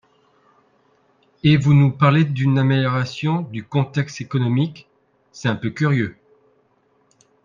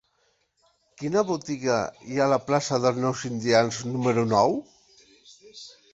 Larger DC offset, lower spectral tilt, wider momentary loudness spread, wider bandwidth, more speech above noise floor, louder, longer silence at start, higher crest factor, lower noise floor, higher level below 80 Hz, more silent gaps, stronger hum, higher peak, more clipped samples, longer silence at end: neither; first, -7.5 dB/octave vs -5 dB/octave; about the same, 10 LU vs 11 LU; second, 7.4 kHz vs 8.2 kHz; about the same, 44 dB vs 45 dB; first, -19 LUFS vs -25 LUFS; first, 1.45 s vs 1 s; about the same, 18 dB vs 22 dB; second, -62 dBFS vs -69 dBFS; first, -56 dBFS vs -64 dBFS; neither; neither; about the same, -2 dBFS vs -4 dBFS; neither; first, 1.35 s vs 0.2 s